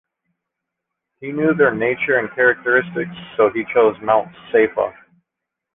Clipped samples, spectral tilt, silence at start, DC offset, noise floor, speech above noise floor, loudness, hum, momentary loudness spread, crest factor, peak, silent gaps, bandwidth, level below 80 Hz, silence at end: under 0.1%; -9 dB/octave; 1.2 s; under 0.1%; -82 dBFS; 65 dB; -18 LUFS; none; 10 LU; 16 dB; -2 dBFS; none; 3.8 kHz; -58 dBFS; 0.85 s